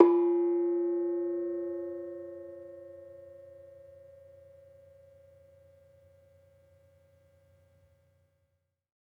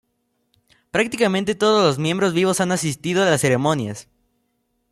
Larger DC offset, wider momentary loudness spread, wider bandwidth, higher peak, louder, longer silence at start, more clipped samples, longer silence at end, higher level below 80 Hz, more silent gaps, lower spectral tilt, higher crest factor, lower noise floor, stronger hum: neither; first, 26 LU vs 7 LU; second, 2.6 kHz vs 15 kHz; about the same, -4 dBFS vs -4 dBFS; second, -31 LUFS vs -19 LUFS; second, 0 s vs 0.95 s; neither; first, 5.3 s vs 0.9 s; second, -82 dBFS vs -58 dBFS; neither; first, -9.5 dB/octave vs -4.5 dB/octave; first, 28 dB vs 18 dB; first, -78 dBFS vs -70 dBFS; neither